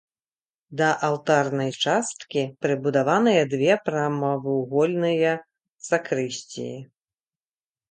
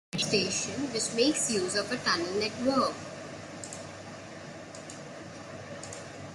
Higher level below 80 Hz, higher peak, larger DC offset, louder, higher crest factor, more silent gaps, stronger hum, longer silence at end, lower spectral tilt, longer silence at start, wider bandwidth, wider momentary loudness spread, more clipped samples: about the same, -72 dBFS vs -68 dBFS; first, -6 dBFS vs -12 dBFS; neither; first, -23 LUFS vs -29 LUFS; about the same, 18 dB vs 20 dB; first, 5.72-5.78 s vs none; neither; first, 1.05 s vs 0 s; first, -5 dB/octave vs -3 dB/octave; first, 0.7 s vs 0.15 s; second, 9.4 kHz vs 12.5 kHz; second, 12 LU vs 17 LU; neither